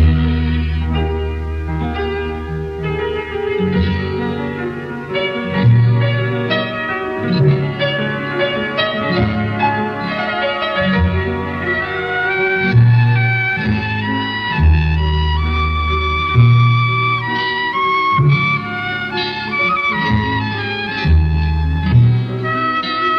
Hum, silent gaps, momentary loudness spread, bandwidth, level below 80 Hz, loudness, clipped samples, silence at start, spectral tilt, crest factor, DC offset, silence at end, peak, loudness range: none; none; 8 LU; 6 kHz; -24 dBFS; -16 LUFS; under 0.1%; 0 s; -8 dB/octave; 14 dB; under 0.1%; 0 s; -2 dBFS; 6 LU